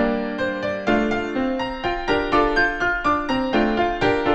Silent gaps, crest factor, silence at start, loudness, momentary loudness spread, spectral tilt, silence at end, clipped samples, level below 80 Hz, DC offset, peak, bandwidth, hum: none; 16 dB; 0 s; -21 LUFS; 5 LU; -5.5 dB/octave; 0 s; under 0.1%; -38 dBFS; under 0.1%; -6 dBFS; 8.6 kHz; none